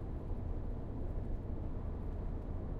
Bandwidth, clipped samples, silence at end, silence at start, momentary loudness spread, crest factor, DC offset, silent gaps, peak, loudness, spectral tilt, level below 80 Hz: 4 kHz; under 0.1%; 0 s; 0 s; 1 LU; 12 dB; under 0.1%; none; -28 dBFS; -43 LUFS; -10.5 dB/octave; -40 dBFS